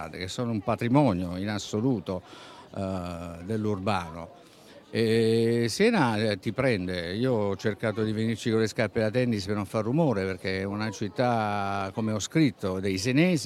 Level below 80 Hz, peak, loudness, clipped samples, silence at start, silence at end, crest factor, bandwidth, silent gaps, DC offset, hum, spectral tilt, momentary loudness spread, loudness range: -60 dBFS; -8 dBFS; -27 LUFS; under 0.1%; 0 s; 0 s; 20 dB; 13.5 kHz; none; under 0.1%; none; -6 dB/octave; 11 LU; 5 LU